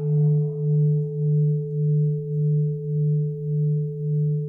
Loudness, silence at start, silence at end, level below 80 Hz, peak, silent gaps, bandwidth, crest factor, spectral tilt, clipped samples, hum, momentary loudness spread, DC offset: -23 LUFS; 0 s; 0 s; -60 dBFS; -14 dBFS; none; 0.8 kHz; 8 dB; -16 dB/octave; under 0.1%; none; 4 LU; under 0.1%